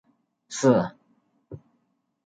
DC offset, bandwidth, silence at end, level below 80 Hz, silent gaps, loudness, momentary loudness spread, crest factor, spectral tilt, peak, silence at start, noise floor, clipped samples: under 0.1%; 9.4 kHz; 0.7 s; -66 dBFS; none; -24 LUFS; 25 LU; 22 dB; -6 dB/octave; -6 dBFS; 0.5 s; -72 dBFS; under 0.1%